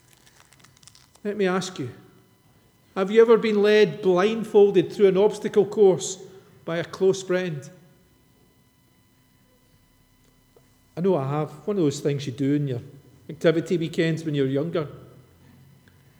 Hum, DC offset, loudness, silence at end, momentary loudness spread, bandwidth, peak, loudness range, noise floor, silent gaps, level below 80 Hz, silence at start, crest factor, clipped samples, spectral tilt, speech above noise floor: none; under 0.1%; -22 LUFS; 1.15 s; 17 LU; 12.5 kHz; -4 dBFS; 11 LU; -60 dBFS; none; -68 dBFS; 1.25 s; 20 dB; under 0.1%; -6 dB/octave; 39 dB